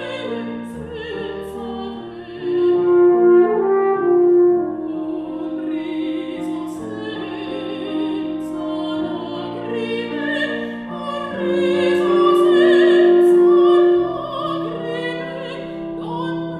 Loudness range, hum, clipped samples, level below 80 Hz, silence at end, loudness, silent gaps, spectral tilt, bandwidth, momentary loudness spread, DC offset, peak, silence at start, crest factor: 11 LU; none; under 0.1%; -54 dBFS; 0 s; -18 LUFS; none; -6.5 dB/octave; 9 kHz; 16 LU; under 0.1%; -4 dBFS; 0 s; 14 dB